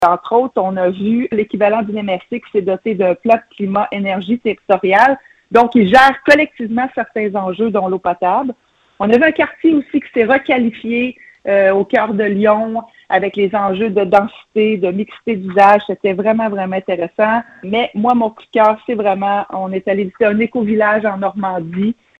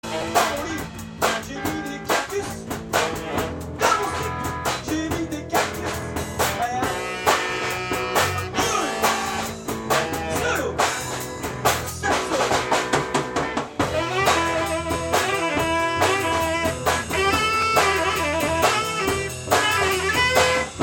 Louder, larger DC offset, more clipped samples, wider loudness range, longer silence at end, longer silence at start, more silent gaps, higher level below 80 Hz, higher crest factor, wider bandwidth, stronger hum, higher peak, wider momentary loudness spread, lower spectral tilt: first, -15 LUFS vs -22 LUFS; neither; neither; about the same, 4 LU vs 4 LU; first, 0.25 s vs 0 s; about the same, 0 s vs 0.05 s; neither; second, -54 dBFS vs -44 dBFS; second, 14 dB vs 20 dB; second, 10.5 kHz vs 17 kHz; neither; first, 0 dBFS vs -4 dBFS; about the same, 9 LU vs 8 LU; first, -7 dB/octave vs -3 dB/octave